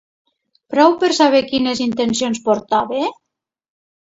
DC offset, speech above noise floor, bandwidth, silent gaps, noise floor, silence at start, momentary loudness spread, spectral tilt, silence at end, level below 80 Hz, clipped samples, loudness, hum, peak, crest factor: under 0.1%; 65 dB; 8 kHz; none; -80 dBFS; 0.7 s; 9 LU; -3.5 dB/octave; 1.05 s; -58 dBFS; under 0.1%; -16 LUFS; none; 0 dBFS; 18 dB